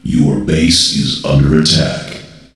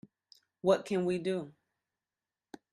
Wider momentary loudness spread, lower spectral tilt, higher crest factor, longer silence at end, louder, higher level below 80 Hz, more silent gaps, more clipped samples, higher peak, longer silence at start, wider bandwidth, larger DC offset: first, 14 LU vs 9 LU; second, -4.5 dB/octave vs -6.5 dB/octave; second, 12 dB vs 20 dB; second, 0.25 s vs 1.2 s; first, -11 LUFS vs -32 LUFS; first, -28 dBFS vs -76 dBFS; neither; neither; first, 0 dBFS vs -14 dBFS; second, 0.05 s vs 0.65 s; about the same, 12.5 kHz vs 11.5 kHz; neither